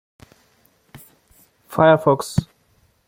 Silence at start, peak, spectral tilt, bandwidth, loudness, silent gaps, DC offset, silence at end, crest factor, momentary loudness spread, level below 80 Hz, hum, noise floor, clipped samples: 1.7 s; -2 dBFS; -6.5 dB/octave; 16.5 kHz; -18 LUFS; none; under 0.1%; 0.65 s; 20 dB; 12 LU; -50 dBFS; none; -61 dBFS; under 0.1%